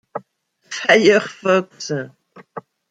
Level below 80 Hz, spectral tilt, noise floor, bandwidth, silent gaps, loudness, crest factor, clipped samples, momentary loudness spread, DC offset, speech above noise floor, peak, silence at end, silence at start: -68 dBFS; -4 dB/octave; -61 dBFS; 9.4 kHz; none; -17 LUFS; 18 dB; under 0.1%; 24 LU; under 0.1%; 45 dB; 0 dBFS; 0.3 s; 0.15 s